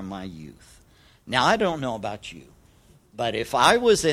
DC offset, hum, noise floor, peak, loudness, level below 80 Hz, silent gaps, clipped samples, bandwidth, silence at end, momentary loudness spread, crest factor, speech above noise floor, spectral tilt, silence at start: under 0.1%; none; -56 dBFS; -2 dBFS; -22 LUFS; -52 dBFS; none; under 0.1%; 16 kHz; 0 s; 20 LU; 22 dB; 32 dB; -3.5 dB/octave; 0 s